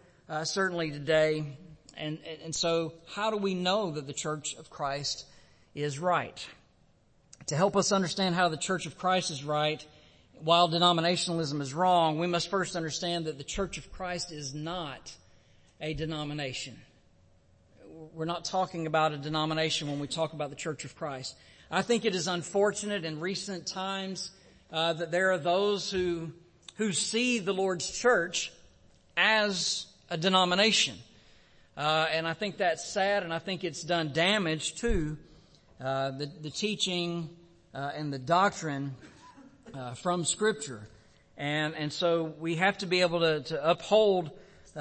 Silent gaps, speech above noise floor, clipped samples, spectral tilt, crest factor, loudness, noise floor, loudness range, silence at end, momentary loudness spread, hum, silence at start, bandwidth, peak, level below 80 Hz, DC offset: none; 35 dB; under 0.1%; -3.5 dB/octave; 22 dB; -30 LUFS; -64 dBFS; 7 LU; 0 s; 13 LU; none; 0.3 s; 8.8 kHz; -8 dBFS; -54 dBFS; under 0.1%